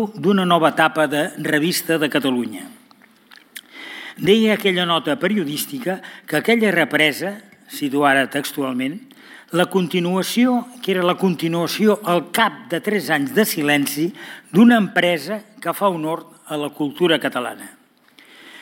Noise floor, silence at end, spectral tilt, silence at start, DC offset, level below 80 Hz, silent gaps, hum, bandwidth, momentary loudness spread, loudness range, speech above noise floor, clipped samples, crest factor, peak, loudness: -51 dBFS; 0 s; -4.5 dB/octave; 0 s; under 0.1%; -68 dBFS; none; none; 17 kHz; 14 LU; 3 LU; 33 dB; under 0.1%; 18 dB; -2 dBFS; -19 LUFS